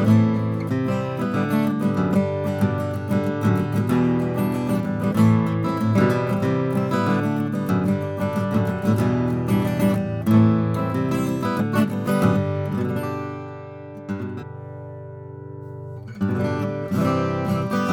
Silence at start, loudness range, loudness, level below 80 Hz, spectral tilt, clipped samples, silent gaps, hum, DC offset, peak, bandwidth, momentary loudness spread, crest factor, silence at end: 0 s; 9 LU; -22 LUFS; -52 dBFS; -8 dB/octave; under 0.1%; none; none; under 0.1%; -4 dBFS; 18 kHz; 16 LU; 16 dB; 0 s